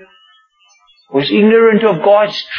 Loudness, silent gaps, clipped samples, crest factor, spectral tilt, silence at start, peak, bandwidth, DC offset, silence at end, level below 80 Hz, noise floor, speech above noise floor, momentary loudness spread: -11 LUFS; none; under 0.1%; 12 dB; -7 dB/octave; 1.1 s; 0 dBFS; 6.6 kHz; under 0.1%; 0 s; -66 dBFS; -52 dBFS; 42 dB; 8 LU